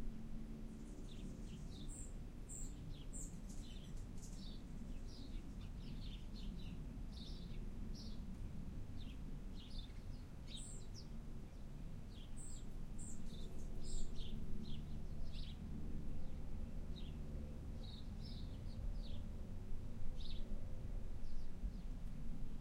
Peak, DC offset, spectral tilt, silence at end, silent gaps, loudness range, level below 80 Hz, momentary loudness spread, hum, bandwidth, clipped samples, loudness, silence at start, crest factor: -28 dBFS; under 0.1%; -5.5 dB/octave; 0 s; none; 2 LU; -48 dBFS; 3 LU; none; 10 kHz; under 0.1%; -52 LUFS; 0 s; 16 dB